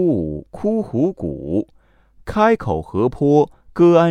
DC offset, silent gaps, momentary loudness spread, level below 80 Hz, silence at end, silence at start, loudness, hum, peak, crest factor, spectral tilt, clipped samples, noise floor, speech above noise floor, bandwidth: under 0.1%; none; 12 LU; -44 dBFS; 0 s; 0 s; -18 LUFS; none; 0 dBFS; 18 dB; -8.5 dB/octave; under 0.1%; -51 dBFS; 34 dB; 8.6 kHz